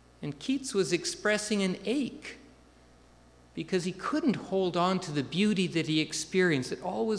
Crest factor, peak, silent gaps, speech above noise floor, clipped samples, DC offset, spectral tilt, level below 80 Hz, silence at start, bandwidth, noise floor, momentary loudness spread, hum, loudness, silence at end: 18 dB; -12 dBFS; none; 28 dB; under 0.1%; under 0.1%; -4.5 dB/octave; -62 dBFS; 0.2 s; 11 kHz; -58 dBFS; 10 LU; 60 Hz at -50 dBFS; -30 LUFS; 0 s